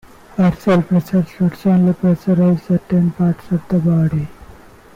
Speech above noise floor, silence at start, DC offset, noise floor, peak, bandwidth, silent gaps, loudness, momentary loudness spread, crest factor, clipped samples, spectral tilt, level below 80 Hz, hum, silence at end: 26 dB; 0.35 s; under 0.1%; -41 dBFS; -6 dBFS; 6.8 kHz; none; -16 LUFS; 5 LU; 10 dB; under 0.1%; -9.5 dB/octave; -44 dBFS; none; 0.5 s